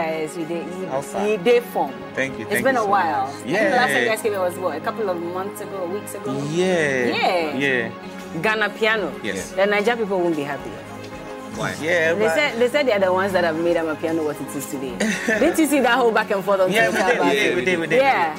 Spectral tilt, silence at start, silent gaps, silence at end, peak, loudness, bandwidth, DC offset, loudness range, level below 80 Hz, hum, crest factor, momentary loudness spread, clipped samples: -4.5 dB/octave; 0 s; none; 0 s; -4 dBFS; -20 LUFS; 16 kHz; under 0.1%; 4 LU; -56 dBFS; none; 16 dB; 11 LU; under 0.1%